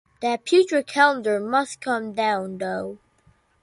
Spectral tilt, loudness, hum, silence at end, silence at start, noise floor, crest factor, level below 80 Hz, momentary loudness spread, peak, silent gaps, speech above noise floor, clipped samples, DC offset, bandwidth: -4 dB/octave; -22 LUFS; none; 0.65 s; 0.2 s; -60 dBFS; 18 dB; -68 dBFS; 10 LU; -4 dBFS; none; 39 dB; under 0.1%; under 0.1%; 11.5 kHz